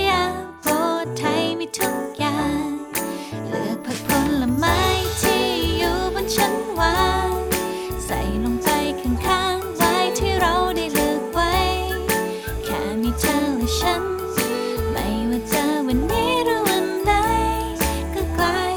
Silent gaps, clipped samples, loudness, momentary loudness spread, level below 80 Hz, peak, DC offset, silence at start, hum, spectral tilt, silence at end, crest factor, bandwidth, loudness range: none; under 0.1%; -21 LUFS; 7 LU; -34 dBFS; -4 dBFS; under 0.1%; 0 s; none; -4 dB/octave; 0 s; 16 dB; over 20 kHz; 3 LU